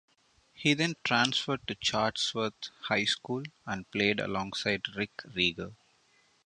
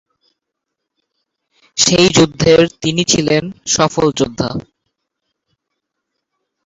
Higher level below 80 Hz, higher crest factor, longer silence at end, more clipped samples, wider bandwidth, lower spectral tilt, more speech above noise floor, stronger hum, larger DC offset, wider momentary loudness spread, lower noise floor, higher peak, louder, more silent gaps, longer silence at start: second, -64 dBFS vs -44 dBFS; first, 22 dB vs 16 dB; second, 0.75 s vs 2.05 s; neither; first, 10.5 kHz vs 8.2 kHz; about the same, -3.5 dB/octave vs -3.5 dB/octave; second, 36 dB vs 64 dB; neither; neither; about the same, 10 LU vs 11 LU; second, -67 dBFS vs -77 dBFS; second, -10 dBFS vs 0 dBFS; second, -30 LUFS vs -13 LUFS; neither; second, 0.55 s vs 1.75 s